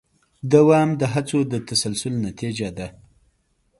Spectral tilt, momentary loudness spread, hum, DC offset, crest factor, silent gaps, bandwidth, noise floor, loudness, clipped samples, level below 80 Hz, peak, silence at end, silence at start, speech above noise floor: -5.5 dB/octave; 16 LU; none; under 0.1%; 20 dB; none; 11.5 kHz; -66 dBFS; -20 LUFS; under 0.1%; -54 dBFS; -2 dBFS; 0.9 s; 0.45 s; 46 dB